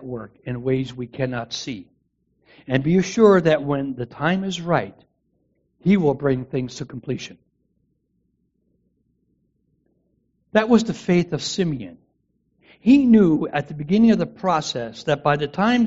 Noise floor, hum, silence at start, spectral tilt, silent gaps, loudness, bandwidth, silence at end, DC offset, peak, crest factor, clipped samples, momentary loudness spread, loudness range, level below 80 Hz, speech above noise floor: -69 dBFS; none; 0 s; -5.5 dB/octave; none; -20 LUFS; 7.8 kHz; 0 s; under 0.1%; -4 dBFS; 18 dB; under 0.1%; 15 LU; 10 LU; -54 dBFS; 50 dB